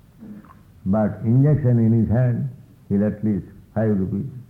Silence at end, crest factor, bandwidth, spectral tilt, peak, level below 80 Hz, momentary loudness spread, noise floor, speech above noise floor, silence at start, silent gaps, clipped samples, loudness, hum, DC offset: 0.1 s; 14 dB; 2.6 kHz; -12 dB/octave; -8 dBFS; -48 dBFS; 14 LU; -45 dBFS; 26 dB; 0.2 s; none; under 0.1%; -21 LUFS; none; under 0.1%